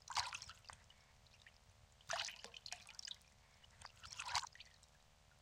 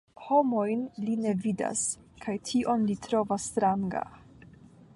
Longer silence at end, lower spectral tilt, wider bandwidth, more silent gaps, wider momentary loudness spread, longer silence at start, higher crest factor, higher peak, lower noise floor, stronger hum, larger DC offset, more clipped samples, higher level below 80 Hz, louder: second, 0 s vs 0.5 s; second, 0.5 dB/octave vs -5 dB/octave; first, 16.5 kHz vs 11.5 kHz; neither; first, 24 LU vs 9 LU; second, 0 s vs 0.2 s; first, 30 dB vs 16 dB; second, -22 dBFS vs -12 dBFS; first, -70 dBFS vs -53 dBFS; neither; neither; neither; second, -72 dBFS vs -62 dBFS; second, -48 LUFS vs -29 LUFS